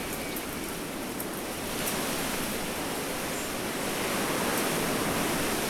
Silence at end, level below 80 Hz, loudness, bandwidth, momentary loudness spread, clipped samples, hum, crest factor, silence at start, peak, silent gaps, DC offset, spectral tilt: 0 s; -50 dBFS; -30 LUFS; 19.5 kHz; 6 LU; under 0.1%; none; 14 dB; 0 s; -16 dBFS; none; under 0.1%; -3 dB/octave